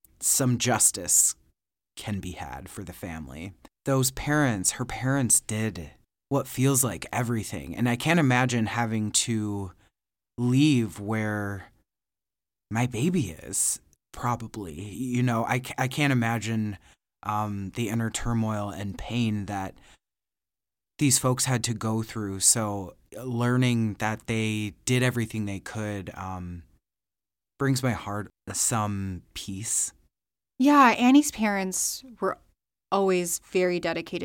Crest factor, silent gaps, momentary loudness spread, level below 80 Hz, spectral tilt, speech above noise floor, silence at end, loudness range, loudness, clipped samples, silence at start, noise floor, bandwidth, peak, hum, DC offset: 20 dB; none; 17 LU; -52 dBFS; -4 dB/octave; over 64 dB; 0 s; 7 LU; -26 LUFS; under 0.1%; 0.2 s; under -90 dBFS; 17 kHz; -6 dBFS; none; under 0.1%